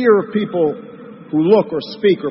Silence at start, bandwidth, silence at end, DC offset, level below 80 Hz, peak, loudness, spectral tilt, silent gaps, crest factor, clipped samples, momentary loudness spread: 0 s; 5.8 kHz; 0 s; under 0.1%; -62 dBFS; -2 dBFS; -17 LUFS; -11 dB/octave; none; 14 dB; under 0.1%; 18 LU